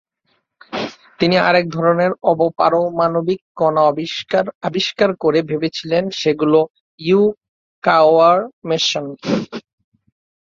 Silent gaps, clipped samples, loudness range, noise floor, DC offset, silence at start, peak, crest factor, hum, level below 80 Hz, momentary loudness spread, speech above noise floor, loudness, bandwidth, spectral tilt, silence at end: 3.41-3.55 s, 4.55-4.61 s, 6.70-6.74 s, 6.81-6.98 s, 7.48-7.82 s, 8.53-8.62 s; under 0.1%; 2 LU; -66 dBFS; under 0.1%; 0.7 s; 0 dBFS; 16 dB; none; -58 dBFS; 11 LU; 51 dB; -17 LUFS; 7.6 kHz; -5.5 dB/octave; 0.9 s